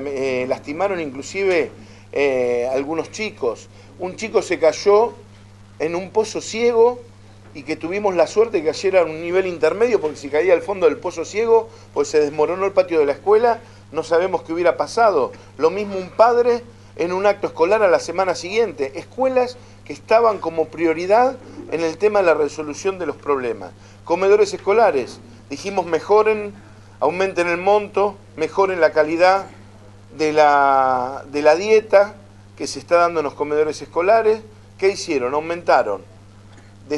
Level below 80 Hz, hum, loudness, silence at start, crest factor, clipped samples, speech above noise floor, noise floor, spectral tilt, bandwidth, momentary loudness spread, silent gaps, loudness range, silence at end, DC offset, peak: -54 dBFS; none; -19 LUFS; 0 s; 18 dB; under 0.1%; 25 dB; -43 dBFS; -4.5 dB/octave; 11.5 kHz; 11 LU; none; 3 LU; 0 s; under 0.1%; 0 dBFS